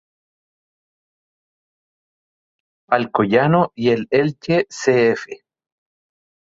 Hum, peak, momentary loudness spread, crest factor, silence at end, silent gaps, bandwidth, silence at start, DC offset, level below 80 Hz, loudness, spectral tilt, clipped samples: none; -2 dBFS; 5 LU; 20 dB; 1.2 s; none; 7.8 kHz; 2.9 s; under 0.1%; -60 dBFS; -18 LUFS; -6.5 dB/octave; under 0.1%